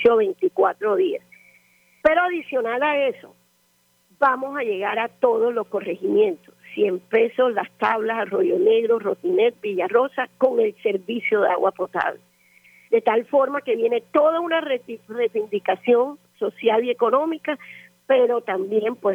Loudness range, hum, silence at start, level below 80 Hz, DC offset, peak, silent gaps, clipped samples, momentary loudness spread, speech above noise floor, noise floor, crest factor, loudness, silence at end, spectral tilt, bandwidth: 2 LU; none; 0 s; -66 dBFS; under 0.1%; -6 dBFS; none; under 0.1%; 7 LU; 43 dB; -63 dBFS; 16 dB; -21 LUFS; 0 s; -6 dB/octave; 5.2 kHz